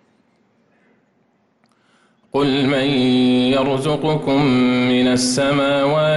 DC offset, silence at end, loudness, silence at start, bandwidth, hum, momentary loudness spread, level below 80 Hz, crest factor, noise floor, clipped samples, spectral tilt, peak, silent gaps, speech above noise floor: under 0.1%; 0 s; -16 LUFS; 2.35 s; 11.5 kHz; none; 4 LU; -50 dBFS; 10 dB; -61 dBFS; under 0.1%; -5 dB/octave; -8 dBFS; none; 46 dB